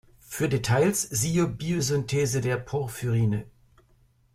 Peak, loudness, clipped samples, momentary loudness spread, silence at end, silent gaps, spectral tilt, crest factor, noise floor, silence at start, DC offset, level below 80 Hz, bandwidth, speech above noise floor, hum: -12 dBFS; -26 LUFS; under 0.1%; 7 LU; 0.85 s; none; -5 dB/octave; 16 dB; -62 dBFS; 0.3 s; under 0.1%; -52 dBFS; 16 kHz; 37 dB; none